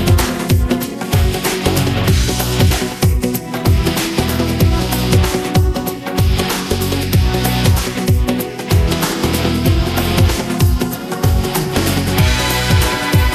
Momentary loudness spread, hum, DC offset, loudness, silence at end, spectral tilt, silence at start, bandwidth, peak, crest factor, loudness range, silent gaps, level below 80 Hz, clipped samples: 4 LU; none; under 0.1%; -15 LUFS; 0 s; -5 dB/octave; 0 s; 14.5 kHz; 0 dBFS; 14 dB; 1 LU; none; -22 dBFS; under 0.1%